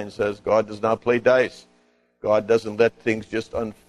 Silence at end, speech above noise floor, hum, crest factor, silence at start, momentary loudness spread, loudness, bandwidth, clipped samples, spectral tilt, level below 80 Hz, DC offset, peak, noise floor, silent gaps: 0.15 s; 40 dB; 60 Hz at -55 dBFS; 16 dB; 0 s; 8 LU; -22 LUFS; 11.5 kHz; under 0.1%; -6 dB/octave; -56 dBFS; under 0.1%; -6 dBFS; -62 dBFS; none